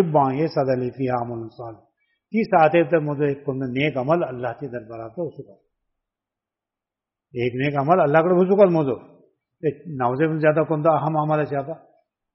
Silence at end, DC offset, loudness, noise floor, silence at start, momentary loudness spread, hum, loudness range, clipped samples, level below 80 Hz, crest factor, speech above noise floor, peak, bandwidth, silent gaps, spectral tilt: 0.55 s; under 0.1%; -21 LUFS; -88 dBFS; 0 s; 16 LU; none; 10 LU; under 0.1%; -64 dBFS; 20 dB; 67 dB; -2 dBFS; 5.8 kHz; none; -6.5 dB/octave